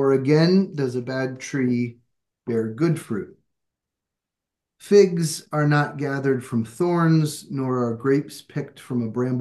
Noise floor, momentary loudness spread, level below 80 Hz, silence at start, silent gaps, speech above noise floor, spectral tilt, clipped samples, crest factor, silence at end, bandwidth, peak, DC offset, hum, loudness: -86 dBFS; 14 LU; -70 dBFS; 0 s; none; 64 dB; -6.5 dB/octave; under 0.1%; 18 dB; 0 s; 12.5 kHz; -4 dBFS; under 0.1%; none; -22 LUFS